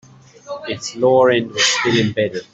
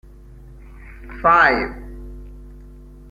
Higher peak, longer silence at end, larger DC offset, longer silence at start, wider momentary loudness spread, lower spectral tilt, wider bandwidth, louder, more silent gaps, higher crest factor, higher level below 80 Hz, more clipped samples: about the same, -4 dBFS vs -2 dBFS; second, 0.1 s vs 0.55 s; neither; second, 0.45 s vs 0.85 s; second, 14 LU vs 26 LU; second, -3.5 dB/octave vs -6 dB/octave; second, 8.4 kHz vs 11 kHz; about the same, -16 LUFS vs -16 LUFS; neither; second, 14 dB vs 22 dB; second, -56 dBFS vs -38 dBFS; neither